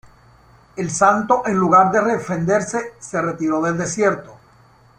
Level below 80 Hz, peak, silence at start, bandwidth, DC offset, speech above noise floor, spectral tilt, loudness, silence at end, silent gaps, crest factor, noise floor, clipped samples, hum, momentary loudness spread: -54 dBFS; -2 dBFS; 0.75 s; 10.5 kHz; under 0.1%; 33 dB; -5.5 dB/octave; -18 LUFS; 0.65 s; none; 18 dB; -51 dBFS; under 0.1%; none; 13 LU